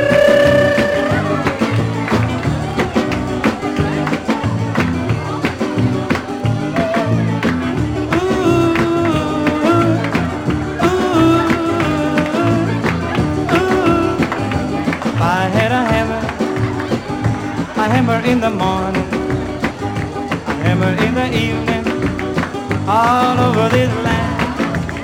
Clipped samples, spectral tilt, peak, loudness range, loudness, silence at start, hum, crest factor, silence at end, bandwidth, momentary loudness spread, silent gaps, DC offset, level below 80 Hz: under 0.1%; -6.5 dB/octave; -2 dBFS; 3 LU; -16 LUFS; 0 s; none; 14 dB; 0 s; 17 kHz; 6 LU; none; under 0.1%; -38 dBFS